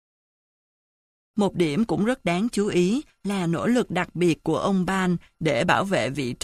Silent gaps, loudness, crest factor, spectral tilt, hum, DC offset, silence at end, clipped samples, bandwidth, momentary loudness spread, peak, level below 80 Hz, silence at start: none; -24 LUFS; 18 dB; -6 dB/octave; none; under 0.1%; 0.1 s; under 0.1%; 13.5 kHz; 5 LU; -6 dBFS; -54 dBFS; 1.35 s